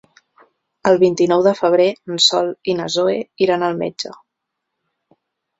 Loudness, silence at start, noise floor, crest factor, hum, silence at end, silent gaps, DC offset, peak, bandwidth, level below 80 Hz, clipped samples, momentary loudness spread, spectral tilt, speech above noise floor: -16 LUFS; 0.85 s; -78 dBFS; 16 dB; none; 1.45 s; none; under 0.1%; -2 dBFS; 8 kHz; -62 dBFS; under 0.1%; 9 LU; -4 dB/octave; 62 dB